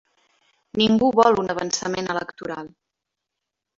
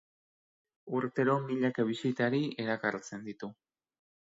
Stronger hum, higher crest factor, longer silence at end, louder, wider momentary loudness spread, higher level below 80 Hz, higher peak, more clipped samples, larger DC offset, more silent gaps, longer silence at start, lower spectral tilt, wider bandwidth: neither; about the same, 20 dB vs 20 dB; first, 1.1 s vs 0.8 s; first, -21 LUFS vs -32 LUFS; first, 16 LU vs 13 LU; first, -58 dBFS vs -78 dBFS; first, -4 dBFS vs -14 dBFS; neither; neither; neither; about the same, 0.75 s vs 0.85 s; second, -4 dB/octave vs -6.5 dB/octave; about the same, 7.6 kHz vs 7.8 kHz